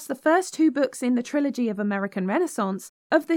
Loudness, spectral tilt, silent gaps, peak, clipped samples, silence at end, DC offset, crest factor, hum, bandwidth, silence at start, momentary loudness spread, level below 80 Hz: -24 LUFS; -5.5 dB/octave; 2.89-3.10 s; -6 dBFS; under 0.1%; 0 s; under 0.1%; 18 dB; none; 16.5 kHz; 0 s; 5 LU; -84 dBFS